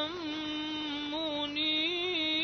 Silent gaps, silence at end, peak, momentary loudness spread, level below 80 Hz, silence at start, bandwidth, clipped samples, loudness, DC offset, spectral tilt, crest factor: none; 0 s; -20 dBFS; 7 LU; -66 dBFS; 0 s; 6.6 kHz; under 0.1%; -32 LUFS; under 0.1%; -3.5 dB/octave; 14 dB